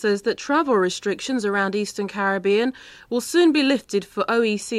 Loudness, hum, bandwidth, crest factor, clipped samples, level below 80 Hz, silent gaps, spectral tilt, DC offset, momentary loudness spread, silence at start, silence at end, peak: -21 LUFS; none; 14.5 kHz; 14 dB; under 0.1%; -62 dBFS; none; -4 dB/octave; under 0.1%; 9 LU; 0 s; 0 s; -8 dBFS